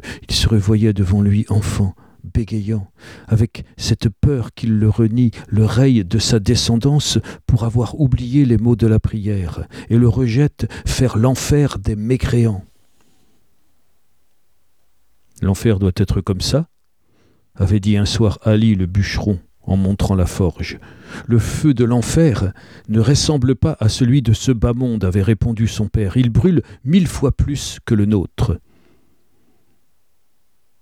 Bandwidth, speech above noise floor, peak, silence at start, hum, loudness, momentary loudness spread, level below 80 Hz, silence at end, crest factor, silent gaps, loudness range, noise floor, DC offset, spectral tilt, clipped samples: 14.5 kHz; 52 dB; -2 dBFS; 0.05 s; none; -17 LUFS; 8 LU; -32 dBFS; 2.25 s; 14 dB; none; 5 LU; -68 dBFS; 0.2%; -6.5 dB/octave; under 0.1%